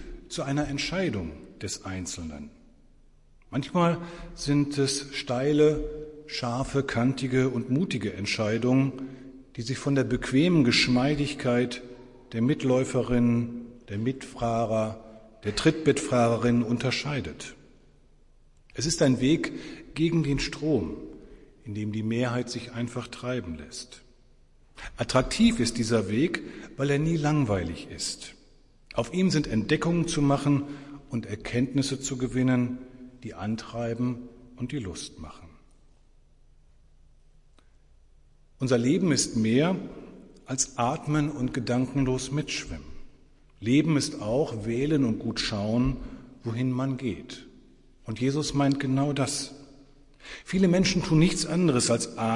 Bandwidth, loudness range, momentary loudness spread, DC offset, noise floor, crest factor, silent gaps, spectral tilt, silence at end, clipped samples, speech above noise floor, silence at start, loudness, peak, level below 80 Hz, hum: 11.5 kHz; 7 LU; 17 LU; under 0.1%; -57 dBFS; 20 dB; none; -5.5 dB/octave; 0 s; under 0.1%; 31 dB; 0 s; -27 LUFS; -8 dBFS; -48 dBFS; none